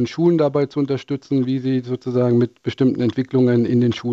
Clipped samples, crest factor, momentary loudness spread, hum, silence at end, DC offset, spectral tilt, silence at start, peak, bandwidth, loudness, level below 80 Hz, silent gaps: under 0.1%; 12 dB; 6 LU; none; 0 s; under 0.1%; -8.5 dB/octave; 0 s; -6 dBFS; 7.4 kHz; -19 LUFS; -60 dBFS; none